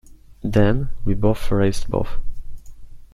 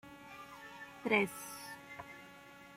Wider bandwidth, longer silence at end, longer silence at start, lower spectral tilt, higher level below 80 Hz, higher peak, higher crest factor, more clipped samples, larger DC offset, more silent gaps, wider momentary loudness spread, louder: second, 12 kHz vs 16.5 kHz; about the same, 0.1 s vs 0 s; about the same, 0.1 s vs 0.05 s; first, -7.5 dB/octave vs -4 dB/octave; first, -28 dBFS vs -76 dBFS; first, -2 dBFS vs -16 dBFS; second, 18 dB vs 26 dB; neither; neither; neither; second, 17 LU vs 20 LU; first, -22 LUFS vs -37 LUFS